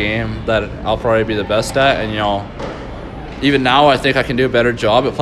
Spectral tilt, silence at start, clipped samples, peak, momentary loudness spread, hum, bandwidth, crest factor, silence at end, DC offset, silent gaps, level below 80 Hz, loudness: -5.5 dB/octave; 0 s; under 0.1%; 0 dBFS; 15 LU; none; 13.5 kHz; 16 dB; 0 s; under 0.1%; none; -34 dBFS; -15 LUFS